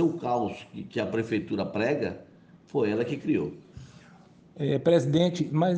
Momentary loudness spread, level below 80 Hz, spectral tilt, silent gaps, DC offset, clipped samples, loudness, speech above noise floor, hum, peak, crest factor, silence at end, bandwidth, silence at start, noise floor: 15 LU; -64 dBFS; -7 dB/octave; none; under 0.1%; under 0.1%; -28 LUFS; 27 dB; none; -10 dBFS; 18 dB; 0 s; 9 kHz; 0 s; -54 dBFS